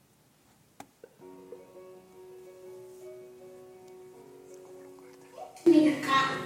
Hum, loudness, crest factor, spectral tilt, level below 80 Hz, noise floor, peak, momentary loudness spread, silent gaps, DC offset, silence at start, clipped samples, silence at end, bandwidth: none; -24 LUFS; 22 dB; -4.5 dB/octave; -78 dBFS; -64 dBFS; -10 dBFS; 28 LU; none; under 0.1%; 1.25 s; under 0.1%; 0 s; 15.5 kHz